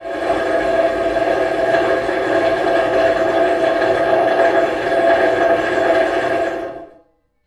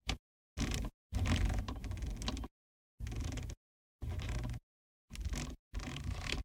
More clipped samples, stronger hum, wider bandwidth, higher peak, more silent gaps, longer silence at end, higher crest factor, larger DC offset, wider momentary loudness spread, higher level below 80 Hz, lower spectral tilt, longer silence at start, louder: neither; neither; second, 11.5 kHz vs 17 kHz; first, -2 dBFS vs -18 dBFS; second, none vs 0.19-0.56 s, 0.94-1.10 s, 2.51-2.98 s, 3.57-3.99 s, 4.63-5.08 s, 5.59-5.71 s; first, 0.6 s vs 0 s; second, 14 dB vs 22 dB; neither; second, 5 LU vs 14 LU; about the same, -46 dBFS vs -44 dBFS; about the same, -5 dB/octave vs -4.5 dB/octave; about the same, 0 s vs 0.05 s; first, -16 LUFS vs -42 LUFS